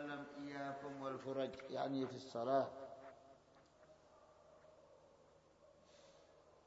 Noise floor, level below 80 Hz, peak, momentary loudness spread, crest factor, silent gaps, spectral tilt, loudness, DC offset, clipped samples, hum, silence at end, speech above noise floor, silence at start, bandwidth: -69 dBFS; -82 dBFS; -24 dBFS; 27 LU; 24 dB; none; -4.5 dB/octave; -45 LUFS; under 0.1%; under 0.1%; none; 0.05 s; 27 dB; 0 s; 7.6 kHz